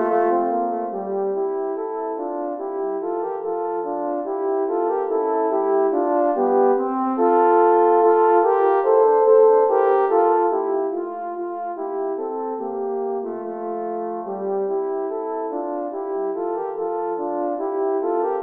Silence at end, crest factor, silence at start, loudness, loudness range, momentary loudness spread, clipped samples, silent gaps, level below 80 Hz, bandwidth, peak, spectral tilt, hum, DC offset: 0 s; 16 dB; 0 s; -21 LUFS; 10 LU; 12 LU; under 0.1%; none; -74 dBFS; 3.3 kHz; -4 dBFS; -9.5 dB/octave; none; under 0.1%